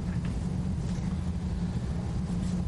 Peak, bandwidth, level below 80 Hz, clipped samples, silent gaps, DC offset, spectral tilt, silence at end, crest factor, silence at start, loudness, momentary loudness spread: -18 dBFS; 11.5 kHz; -38 dBFS; under 0.1%; none; under 0.1%; -7.5 dB/octave; 0 s; 12 dB; 0 s; -32 LUFS; 1 LU